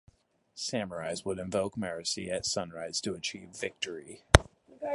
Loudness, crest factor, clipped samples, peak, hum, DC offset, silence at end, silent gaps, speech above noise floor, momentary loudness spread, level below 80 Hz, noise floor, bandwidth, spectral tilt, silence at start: -32 LUFS; 32 dB; under 0.1%; 0 dBFS; none; under 0.1%; 0 s; none; 33 dB; 14 LU; -40 dBFS; -65 dBFS; 12 kHz; -4 dB/octave; 0.55 s